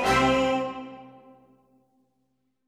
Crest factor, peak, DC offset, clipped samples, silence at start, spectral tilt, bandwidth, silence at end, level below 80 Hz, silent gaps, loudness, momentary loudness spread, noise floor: 22 dB; -8 dBFS; under 0.1%; under 0.1%; 0 s; -4.5 dB/octave; 15.5 kHz; 1.6 s; -48 dBFS; none; -24 LUFS; 22 LU; -74 dBFS